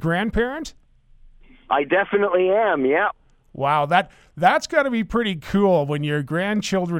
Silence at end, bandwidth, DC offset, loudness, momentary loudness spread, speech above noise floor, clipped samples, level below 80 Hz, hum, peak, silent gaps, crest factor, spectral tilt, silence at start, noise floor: 0 s; 15.5 kHz; under 0.1%; -20 LUFS; 6 LU; 30 dB; under 0.1%; -44 dBFS; none; -2 dBFS; none; 18 dB; -6 dB/octave; 0 s; -50 dBFS